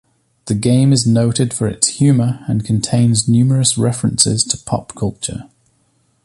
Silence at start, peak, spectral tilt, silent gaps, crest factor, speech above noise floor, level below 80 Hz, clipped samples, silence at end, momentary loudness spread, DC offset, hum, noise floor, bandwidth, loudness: 0.45 s; 0 dBFS; -5 dB/octave; none; 16 dB; 45 dB; -44 dBFS; under 0.1%; 0.8 s; 10 LU; under 0.1%; none; -60 dBFS; 11.5 kHz; -15 LUFS